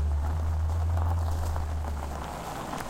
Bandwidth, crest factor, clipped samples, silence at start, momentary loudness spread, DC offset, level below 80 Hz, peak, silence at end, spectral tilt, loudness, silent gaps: 15.5 kHz; 14 dB; under 0.1%; 0 s; 8 LU; under 0.1%; -32 dBFS; -16 dBFS; 0 s; -6.5 dB/octave; -31 LUFS; none